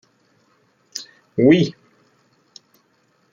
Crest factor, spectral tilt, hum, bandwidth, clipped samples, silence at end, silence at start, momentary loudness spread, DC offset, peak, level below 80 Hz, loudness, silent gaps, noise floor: 20 dB; -6.5 dB/octave; none; 14 kHz; under 0.1%; 1.6 s; 0.95 s; 19 LU; under 0.1%; -2 dBFS; -62 dBFS; -17 LUFS; none; -62 dBFS